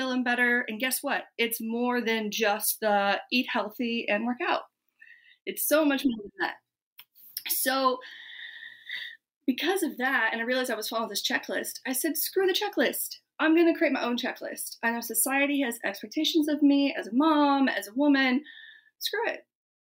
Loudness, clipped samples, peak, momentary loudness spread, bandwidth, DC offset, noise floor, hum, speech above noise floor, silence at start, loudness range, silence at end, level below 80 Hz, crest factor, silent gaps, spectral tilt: -27 LUFS; under 0.1%; -12 dBFS; 13 LU; 16 kHz; under 0.1%; -57 dBFS; none; 30 dB; 0 s; 5 LU; 0.45 s; -78 dBFS; 16 dB; 5.41-5.46 s, 6.82-6.96 s, 9.36-9.41 s; -2 dB/octave